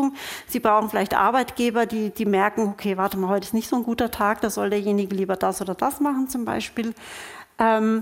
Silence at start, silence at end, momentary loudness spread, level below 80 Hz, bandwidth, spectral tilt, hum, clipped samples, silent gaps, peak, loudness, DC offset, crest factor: 0 s; 0 s; 9 LU; -54 dBFS; 17 kHz; -5 dB/octave; none; under 0.1%; none; -4 dBFS; -23 LUFS; under 0.1%; 18 dB